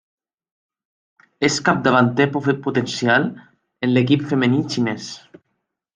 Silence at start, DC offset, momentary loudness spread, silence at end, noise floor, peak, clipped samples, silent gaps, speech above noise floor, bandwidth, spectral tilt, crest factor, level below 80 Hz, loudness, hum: 1.4 s; under 0.1%; 10 LU; 0.75 s; -75 dBFS; -2 dBFS; under 0.1%; none; 56 dB; 9.6 kHz; -5.5 dB/octave; 18 dB; -62 dBFS; -19 LUFS; none